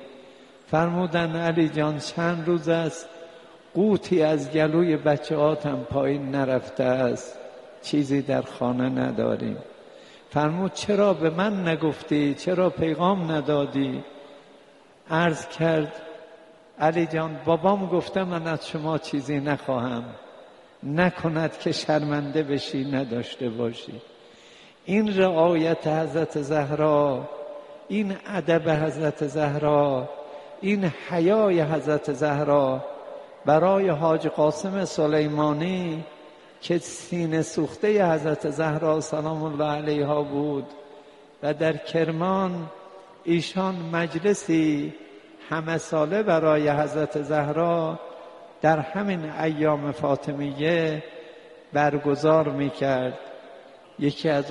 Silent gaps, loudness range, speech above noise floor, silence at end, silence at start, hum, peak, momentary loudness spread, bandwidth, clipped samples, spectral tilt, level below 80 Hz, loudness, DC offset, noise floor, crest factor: none; 4 LU; 29 dB; 0 s; 0 s; none; -4 dBFS; 13 LU; 11.5 kHz; under 0.1%; -6.5 dB/octave; -62 dBFS; -24 LUFS; under 0.1%; -53 dBFS; 20 dB